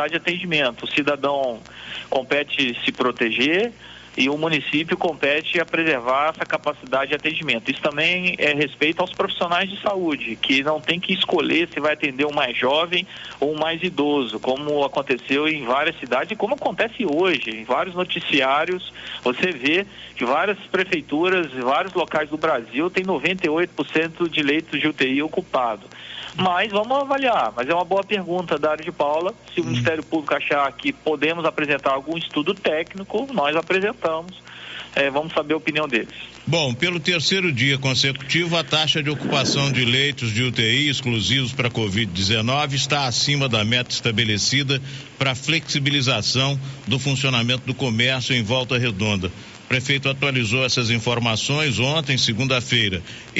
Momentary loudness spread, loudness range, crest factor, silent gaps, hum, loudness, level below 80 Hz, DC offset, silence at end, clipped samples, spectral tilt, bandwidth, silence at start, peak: 6 LU; 3 LU; 16 dB; none; none; -21 LUFS; -56 dBFS; under 0.1%; 0 s; under 0.1%; -2.5 dB/octave; 8 kHz; 0 s; -4 dBFS